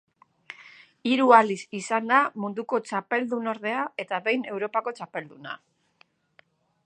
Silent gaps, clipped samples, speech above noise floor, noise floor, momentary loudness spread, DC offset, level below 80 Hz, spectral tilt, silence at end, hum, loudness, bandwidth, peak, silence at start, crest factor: none; under 0.1%; 39 dB; -64 dBFS; 21 LU; under 0.1%; -84 dBFS; -4.5 dB/octave; 1.3 s; none; -25 LUFS; 9.6 kHz; -2 dBFS; 0.5 s; 24 dB